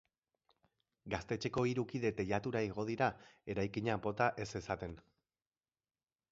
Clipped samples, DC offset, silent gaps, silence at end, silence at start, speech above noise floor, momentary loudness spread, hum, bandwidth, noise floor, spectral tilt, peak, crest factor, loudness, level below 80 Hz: under 0.1%; under 0.1%; none; 1.3 s; 1.05 s; over 52 dB; 8 LU; none; 7.6 kHz; under -90 dBFS; -5.5 dB/octave; -18 dBFS; 22 dB; -38 LUFS; -62 dBFS